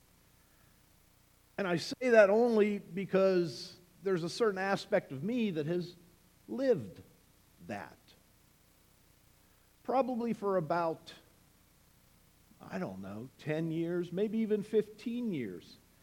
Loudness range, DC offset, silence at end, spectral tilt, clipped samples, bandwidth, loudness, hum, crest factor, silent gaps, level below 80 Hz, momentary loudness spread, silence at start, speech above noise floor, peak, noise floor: 10 LU; under 0.1%; 0.3 s; -6.5 dB/octave; under 0.1%; 18.5 kHz; -33 LUFS; none; 24 dB; none; -72 dBFS; 17 LU; 1.6 s; 34 dB; -10 dBFS; -66 dBFS